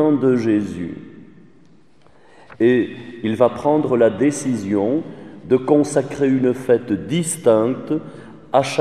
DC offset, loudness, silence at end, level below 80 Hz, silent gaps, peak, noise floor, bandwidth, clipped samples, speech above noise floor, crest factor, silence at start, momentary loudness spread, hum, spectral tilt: 0.3%; -19 LUFS; 0 s; -58 dBFS; none; 0 dBFS; -53 dBFS; 13.5 kHz; under 0.1%; 35 dB; 18 dB; 0 s; 11 LU; none; -6 dB/octave